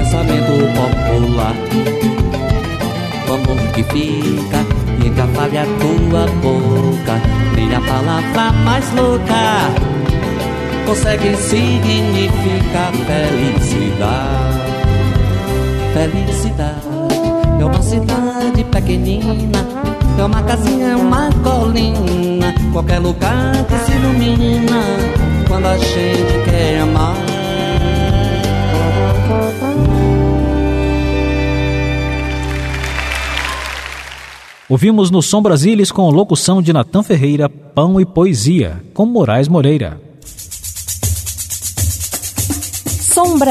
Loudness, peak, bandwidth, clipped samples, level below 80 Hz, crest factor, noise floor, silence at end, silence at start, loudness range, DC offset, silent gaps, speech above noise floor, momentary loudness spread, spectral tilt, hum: -14 LUFS; 0 dBFS; 14 kHz; under 0.1%; -22 dBFS; 12 dB; -35 dBFS; 0 s; 0 s; 4 LU; under 0.1%; none; 22 dB; 7 LU; -5.5 dB/octave; none